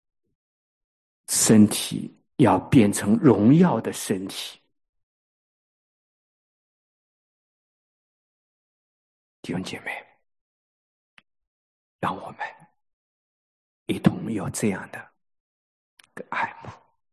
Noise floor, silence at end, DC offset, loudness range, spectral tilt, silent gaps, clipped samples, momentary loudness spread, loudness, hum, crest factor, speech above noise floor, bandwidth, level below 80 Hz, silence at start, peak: under -90 dBFS; 0.4 s; under 0.1%; 19 LU; -5 dB/octave; 4.89-4.93 s, 5.03-9.43 s, 10.41-11.17 s, 11.47-11.99 s, 12.93-13.86 s, 15.40-15.97 s; under 0.1%; 20 LU; -22 LUFS; none; 24 dB; over 69 dB; 12.5 kHz; -56 dBFS; 1.3 s; -2 dBFS